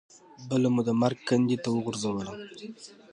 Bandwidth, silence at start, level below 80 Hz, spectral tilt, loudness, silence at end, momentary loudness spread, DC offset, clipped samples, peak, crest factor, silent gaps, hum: 10.5 kHz; 0.4 s; -66 dBFS; -6 dB/octave; -27 LUFS; 0.2 s; 18 LU; under 0.1%; under 0.1%; -10 dBFS; 18 dB; none; none